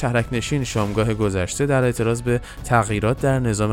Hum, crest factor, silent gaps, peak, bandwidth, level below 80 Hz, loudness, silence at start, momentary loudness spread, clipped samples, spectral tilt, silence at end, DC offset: none; 16 dB; none; -4 dBFS; 16 kHz; -38 dBFS; -21 LUFS; 0 s; 4 LU; under 0.1%; -6 dB/octave; 0 s; under 0.1%